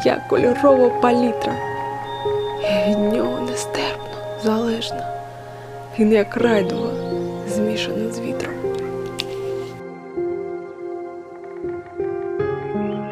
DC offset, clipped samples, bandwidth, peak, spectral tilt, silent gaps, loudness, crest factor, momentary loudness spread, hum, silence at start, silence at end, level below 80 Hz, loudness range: under 0.1%; under 0.1%; 15.5 kHz; 0 dBFS; -5.5 dB/octave; none; -21 LUFS; 20 dB; 14 LU; none; 0 s; 0 s; -52 dBFS; 9 LU